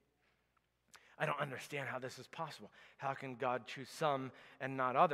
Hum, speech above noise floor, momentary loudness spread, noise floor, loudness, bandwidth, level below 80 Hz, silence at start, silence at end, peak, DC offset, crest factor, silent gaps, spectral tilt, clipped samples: none; 40 dB; 10 LU; -80 dBFS; -41 LUFS; 15.5 kHz; -88 dBFS; 0.95 s; 0 s; -18 dBFS; under 0.1%; 24 dB; none; -5 dB/octave; under 0.1%